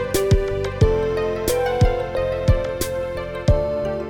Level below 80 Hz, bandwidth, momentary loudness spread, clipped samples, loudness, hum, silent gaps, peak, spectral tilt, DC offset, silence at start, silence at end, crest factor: -26 dBFS; 18.5 kHz; 6 LU; under 0.1%; -21 LUFS; none; none; -4 dBFS; -6 dB/octave; under 0.1%; 0 s; 0 s; 16 dB